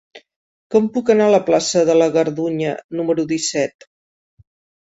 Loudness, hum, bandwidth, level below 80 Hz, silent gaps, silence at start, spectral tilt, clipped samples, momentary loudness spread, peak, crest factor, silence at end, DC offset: -17 LUFS; none; 8 kHz; -62 dBFS; 0.36-0.70 s, 2.84-2.89 s; 0.15 s; -4.5 dB/octave; under 0.1%; 9 LU; -2 dBFS; 16 dB; 1.2 s; under 0.1%